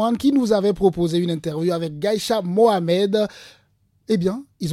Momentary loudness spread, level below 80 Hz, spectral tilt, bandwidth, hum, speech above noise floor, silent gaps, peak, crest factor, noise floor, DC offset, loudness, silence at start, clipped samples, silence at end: 7 LU; -52 dBFS; -6.5 dB/octave; 15.5 kHz; none; 39 dB; none; -4 dBFS; 16 dB; -59 dBFS; under 0.1%; -20 LUFS; 0 s; under 0.1%; 0 s